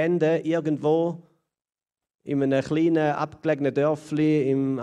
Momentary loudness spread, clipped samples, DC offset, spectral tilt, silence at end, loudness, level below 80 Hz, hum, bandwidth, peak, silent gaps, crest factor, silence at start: 6 LU; under 0.1%; under 0.1%; -8 dB/octave; 0 s; -24 LUFS; -66 dBFS; none; 10 kHz; -10 dBFS; 2.15-2.19 s; 14 dB; 0 s